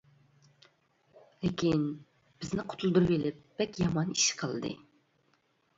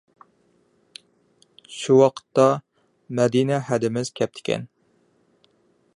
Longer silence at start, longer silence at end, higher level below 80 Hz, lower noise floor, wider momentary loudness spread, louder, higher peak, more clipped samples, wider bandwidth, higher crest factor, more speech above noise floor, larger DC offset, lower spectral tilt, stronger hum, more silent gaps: second, 1.4 s vs 1.7 s; second, 1 s vs 1.3 s; first, -60 dBFS vs -68 dBFS; first, -72 dBFS vs -63 dBFS; about the same, 12 LU vs 14 LU; second, -31 LUFS vs -22 LUFS; second, -14 dBFS vs -2 dBFS; neither; second, 7.8 kHz vs 11 kHz; about the same, 20 dB vs 22 dB; about the same, 41 dB vs 43 dB; neither; second, -4.5 dB/octave vs -6 dB/octave; neither; neither